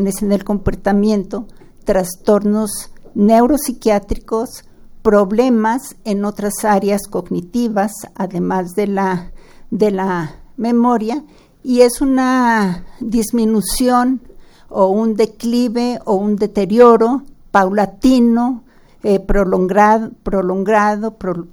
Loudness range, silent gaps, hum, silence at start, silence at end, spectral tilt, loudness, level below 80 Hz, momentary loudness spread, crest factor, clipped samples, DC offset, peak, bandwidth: 5 LU; none; none; 0 s; 0.05 s; -6 dB/octave; -15 LUFS; -34 dBFS; 11 LU; 16 dB; under 0.1%; under 0.1%; 0 dBFS; over 20 kHz